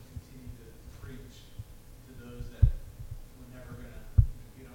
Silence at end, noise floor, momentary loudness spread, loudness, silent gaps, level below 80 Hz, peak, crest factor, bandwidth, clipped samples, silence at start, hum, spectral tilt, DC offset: 0 s; -50 dBFS; 21 LU; -31 LUFS; none; -36 dBFS; -8 dBFS; 26 dB; 17 kHz; under 0.1%; 0 s; none; -7.5 dB/octave; under 0.1%